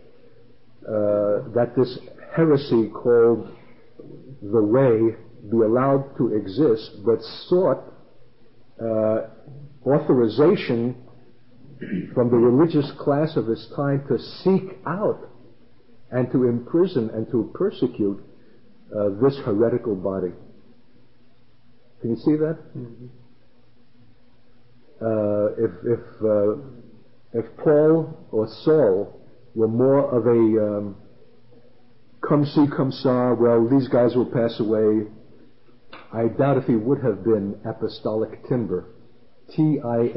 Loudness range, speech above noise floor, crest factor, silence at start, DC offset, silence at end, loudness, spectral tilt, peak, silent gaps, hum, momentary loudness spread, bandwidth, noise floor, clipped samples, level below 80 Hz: 6 LU; 38 dB; 16 dB; 0.85 s; 0.5%; 0 s; -22 LUFS; -12.5 dB/octave; -6 dBFS; none; none; 12 LU; 5.8 kHz; -58 dBFS; under 0.1%; -60 dBFS